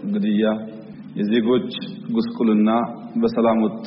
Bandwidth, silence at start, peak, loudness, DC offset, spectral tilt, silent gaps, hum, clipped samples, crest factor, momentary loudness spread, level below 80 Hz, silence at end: 5.8 kHz; 0 s; -8 dBFS; -21 LUFS; under 0.1%; -6 dB/octave; none; none; under 0.1%; 12 dB; 12 LU; -60 dBFS; 0 s